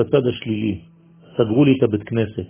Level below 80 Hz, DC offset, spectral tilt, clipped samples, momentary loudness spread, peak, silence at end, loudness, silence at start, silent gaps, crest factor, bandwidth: -48 dBFS; under 0.1%; -12 dB/octave; under 0.1%; 11 LU; -4 dBFS; 0.05 s; -19 LUFS; 0 s; none; 16 dB; 3.6 kHz